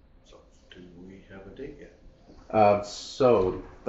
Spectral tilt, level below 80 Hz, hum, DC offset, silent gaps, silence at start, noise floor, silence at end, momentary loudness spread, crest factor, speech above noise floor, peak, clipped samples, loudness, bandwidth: -5 dB/octave; -52 dBFS; none; under 0.1%; none; 1 s; -54 dBFS; 0.2 s; 25 LU; 20 dB; 30 dB; -8 dBFS; under 0.1%; -24 LUFS; 8 kHz